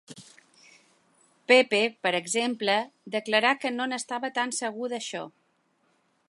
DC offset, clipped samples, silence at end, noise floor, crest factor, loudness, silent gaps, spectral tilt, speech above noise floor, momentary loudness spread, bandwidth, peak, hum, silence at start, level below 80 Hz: under 0.1%; under 0.1%; 1 s; -70 dBFS; 24 dB; -26 LUFS; none; -2 dB/octave; 43 dB; 14 LU; 11.5 kHz; -4 dBFS; none; 0.1 s; -84 dBFS